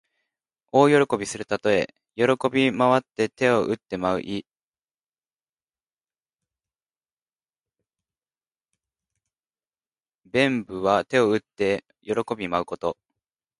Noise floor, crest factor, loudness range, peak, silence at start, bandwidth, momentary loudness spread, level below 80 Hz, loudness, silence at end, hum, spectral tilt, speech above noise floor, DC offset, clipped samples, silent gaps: under -90 dBFS; 22 dB; 11 LU; -4 dBFS; 0.75 s; 11.5 kHz; 10 LU; -60 dBFS; -23 LUFS; 0.65 s; none; -5.5 dB/octave; over 67 dB; under 0.1%; under 0.1%; 4.67-4.72 s, 5.08-5.12 s, 5.49-5.57 s, 7.12-7.17 s, 10.15-10.19 s